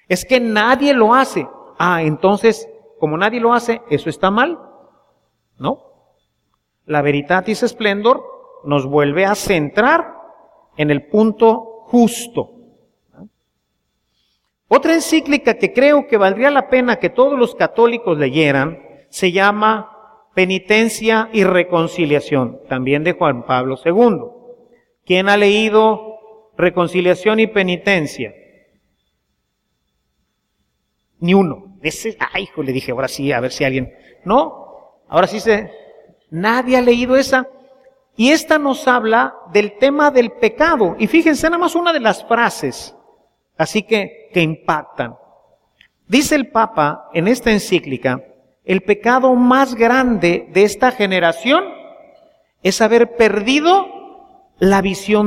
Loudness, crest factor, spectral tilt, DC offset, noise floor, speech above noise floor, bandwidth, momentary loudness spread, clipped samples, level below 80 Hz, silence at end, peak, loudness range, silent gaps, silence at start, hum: -15 LUFS; 16 dB; -5 dB/octave; under 0.1%; -70 dBFS; 56 dB; 16 kHz; 11 LU; under 0.1%; -48 dBFS; 0 s; 0 dBFS; 6 LU; none; 0.1 s; none